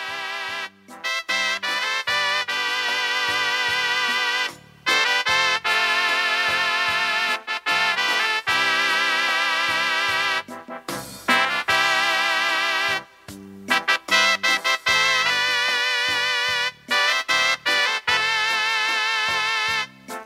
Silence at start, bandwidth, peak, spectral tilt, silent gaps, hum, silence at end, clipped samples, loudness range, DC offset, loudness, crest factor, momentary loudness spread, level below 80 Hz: 0 s; 16 kHz; -2 dBFS; 0 dB/octave; none; none; 0 s; under 0.1%; 2 LU; under 0.1%; -20 LUFS; 20 dB; 9 LU; -64 dBFS